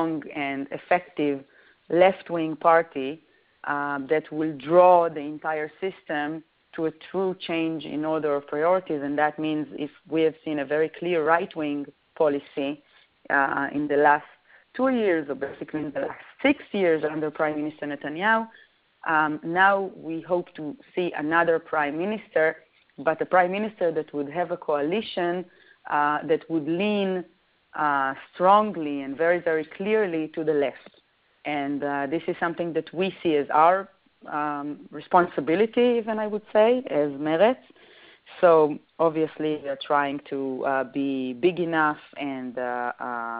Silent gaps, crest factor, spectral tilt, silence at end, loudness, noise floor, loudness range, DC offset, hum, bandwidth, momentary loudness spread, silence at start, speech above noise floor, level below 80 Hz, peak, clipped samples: none; 20 dB; -3.5 dB/octave; 0 s; -25 LUFS; -59 dBFS; 4 LU; under 0.1%; none; 4.9 kHz; 12 LU; 0 s; 35 dB; -68 dBFS; -4 dBFS; under 0.1%